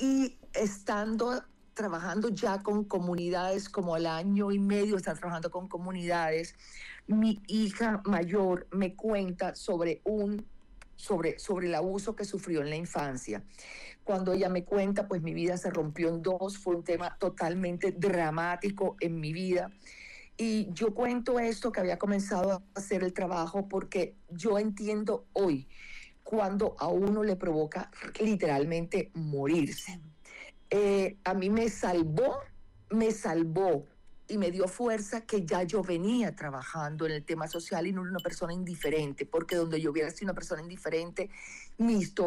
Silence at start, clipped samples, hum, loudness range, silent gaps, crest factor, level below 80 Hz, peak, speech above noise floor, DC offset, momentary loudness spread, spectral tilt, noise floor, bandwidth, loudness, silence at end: 0 s; under 0.1%; none; 3 LU; none; 10 dB; -56 dBFS; -22 dBFS; 19 dB; under 0.1%; 9 LU; -6 dB/octave; -51 dBFS; 14.5 kHz; -32 LUFS; 0 s